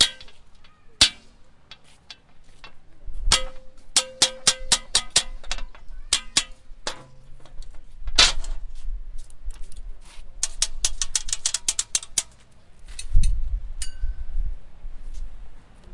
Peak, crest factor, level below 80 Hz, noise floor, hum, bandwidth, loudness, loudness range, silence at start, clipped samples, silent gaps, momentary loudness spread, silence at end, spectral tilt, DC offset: -2 dBFS; 24 dB; -30 dBFS; -48 dBFS; none; 11.5 kHz; -23 LUFS; 7 LU; 0 s; under 0.1%; none; 26 LU; 0 s; 0 dB/octave; under 0.1%